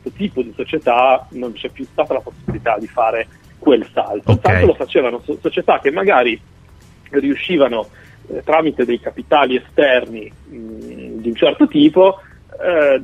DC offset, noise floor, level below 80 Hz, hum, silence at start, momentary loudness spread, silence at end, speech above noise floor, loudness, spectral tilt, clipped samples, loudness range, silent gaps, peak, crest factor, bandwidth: under 0.1%; -44 dBFS; -44 dBFS; none; 0.05 s; 16 LU; 0 s; 28 dB; -16 LUFS; -7.5 dB/octave; under 0.1%; 3 LU; none; 0 dBFS; 16 dB; 9.2 kHz